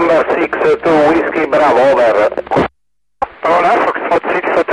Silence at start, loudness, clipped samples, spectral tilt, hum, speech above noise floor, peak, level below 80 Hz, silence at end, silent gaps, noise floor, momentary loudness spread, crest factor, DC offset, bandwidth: 0 s; -12 LUFS; under 0.1%; -6 dB/octave; none; 61 dB; -2 dBFS; -44 dBFS; 0 s; none; -72 dBFS; 6 LU; 10 dB; 0.1%; 11 kHz